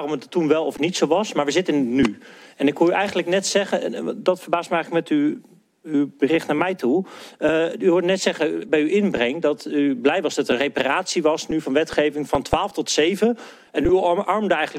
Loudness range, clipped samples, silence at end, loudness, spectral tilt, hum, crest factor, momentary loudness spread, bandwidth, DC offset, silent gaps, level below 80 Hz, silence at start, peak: 2 LU; under 0.1%; 0 s; -21 LUFS; -4.5 dB/octave; none; 18 dB; 5 LU; 15 kHz; under 0.1%; none; -50 dBFS; 0 s; -2 dBFS